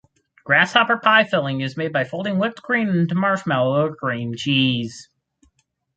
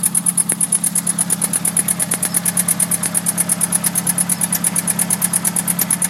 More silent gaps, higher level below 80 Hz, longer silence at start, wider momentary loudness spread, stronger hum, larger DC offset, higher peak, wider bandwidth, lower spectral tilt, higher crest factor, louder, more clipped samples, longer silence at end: neither; about the same, -62 dBFS vs -62 dBFS; first, 0.45 s vs 0 s; first, 10 LU vs 2 LU; neither; neither; about the same, -2 dBFS vs 0 dBFS; second, 9 kHz vs 16.5 kHz; first, -5.5 dB/octave vs -2 dB/octave; about the same, 20 dB vs 18 dB; second, -19 LUFS vs -15 LUFS; neither; first, 0.95 s vs 0 s